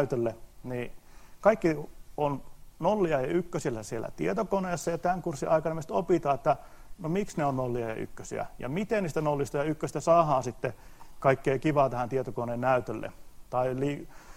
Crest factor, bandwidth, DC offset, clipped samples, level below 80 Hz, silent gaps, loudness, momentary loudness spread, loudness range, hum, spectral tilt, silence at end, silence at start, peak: 20 dB; 16 kHz; under 0.1%; under 0.1%; -52 dBFS; none; -30 LUFS; 12 LU; 3 LU; none; -6.5 dB/octave; 0 s; 0 s; -8 dBFS